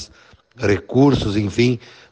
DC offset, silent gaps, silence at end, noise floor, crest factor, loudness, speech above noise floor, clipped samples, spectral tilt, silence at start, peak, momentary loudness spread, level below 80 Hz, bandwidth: under 0.1%; none; 0.35 s; -50 dBFS; 16 dB; -18 LUFS; 32 dB; under 0.1%; -6.5 dB/octave; 0 s; -4 dBFS; 11 LU; -42 dBFS; 9 kHz